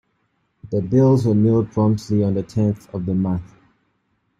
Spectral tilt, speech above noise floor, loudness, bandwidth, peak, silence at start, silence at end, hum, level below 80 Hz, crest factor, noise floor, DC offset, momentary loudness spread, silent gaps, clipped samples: -9.5 dB/octave; 50 dB; -19 LUFS; 10.5 kHz; -4 dBFS; 0.65 s; 0.9 s; none; -52 dBFS; 16 dB; -68 dBFS; under 0.1%; 10 LU; none; under 0.1%